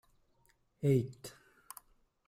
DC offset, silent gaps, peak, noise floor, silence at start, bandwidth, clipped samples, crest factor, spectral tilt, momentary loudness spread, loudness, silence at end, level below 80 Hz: under 0.1%; none; -18 dBFS; -72 dBFS; 0.8 s; 16 kHz; under 0.1%; 20 dB; -7.5 dB/octave; 21 LU; -34 LUFS; 1 s; -70 dBFS